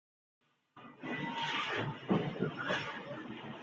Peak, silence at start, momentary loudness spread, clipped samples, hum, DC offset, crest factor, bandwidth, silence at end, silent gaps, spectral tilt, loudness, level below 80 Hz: -20 dBFS; 0.75 s; 12 LU; under 0.1%; none; under 0.1%; 20 dB; 7.8 kHz; 0 s; none; -5.5 dB/octave; -37 LUFS; -72 dBFS